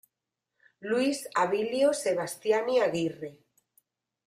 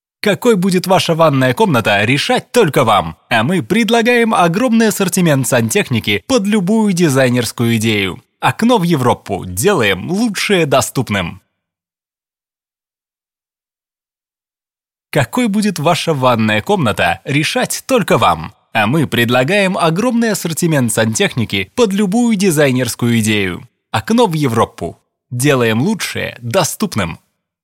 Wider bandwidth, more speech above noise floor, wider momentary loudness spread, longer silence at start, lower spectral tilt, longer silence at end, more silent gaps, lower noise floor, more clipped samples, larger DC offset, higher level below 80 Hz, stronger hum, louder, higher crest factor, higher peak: about the same, 15.5 kHz vs 17 kHz; second, 59 dB vs over 77 dB; first, 11 LU vs 6 LU; first, 0.8 s vs 0.25 s; about the same, -4 dB/octave vs -5 dB/octave; first, 0.95 s vs 0.5 s; neither; second, -86 dBFS vs under -90 dBFS; neither; neither; second, -76 dBFS vs -48 dBFS; neither; second, -28 LUFS vs -14 LUFS; about the same, 16 dB vs 14 dB; second, -14 dBFS vs 0 dBFS